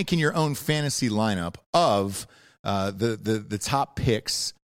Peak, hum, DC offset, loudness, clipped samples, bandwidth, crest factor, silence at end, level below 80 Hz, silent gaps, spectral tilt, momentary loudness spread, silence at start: -8 dBFS; none; under 0.1%; -25 LUFS; under 0.1%; 16.5 kHz; 18 dB; 0.15 s; -50 dBFS; 1.66-1.73 s, 2.59-2.64 s; -4.5 dB/octave; 8 LU; 0 s